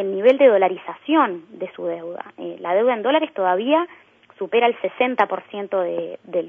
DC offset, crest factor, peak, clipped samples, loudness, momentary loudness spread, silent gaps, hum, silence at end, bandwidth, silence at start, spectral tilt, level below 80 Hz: under 0.1%; 18 dB; -2 dBFS; under 0.1%; -20 LUFS; 16 LU; none; none; 0 s; 3.7 kHz; 0 s; -7 dB/octave; -78 dBFS